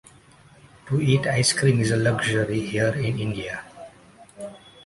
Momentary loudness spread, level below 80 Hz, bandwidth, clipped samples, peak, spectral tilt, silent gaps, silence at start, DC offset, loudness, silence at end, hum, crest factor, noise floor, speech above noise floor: 20 LU; -52 dBFS; 11.5 kHz; under 0.1%; -6 dBFS; -5 dB/octave; none; 0.85 s; under 0.1%; -22 LUFS; 0.3 s; none; 18 dB; -52 dBFS; 30 dB